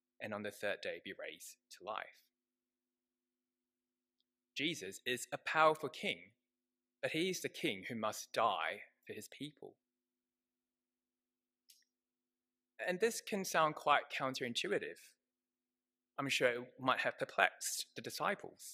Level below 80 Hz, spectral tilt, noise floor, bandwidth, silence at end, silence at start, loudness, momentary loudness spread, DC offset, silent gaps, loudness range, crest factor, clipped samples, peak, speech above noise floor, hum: under -90 dBFS; -3 dB/octave; under -90 dBFS; 15.5 kHz; 0 s; 0.2 s; -38 LUFS; 16 LU; under 0.1%; none; 14 LU; 30 dB; under 0.1%; -12 dBFS; over 51 dB; none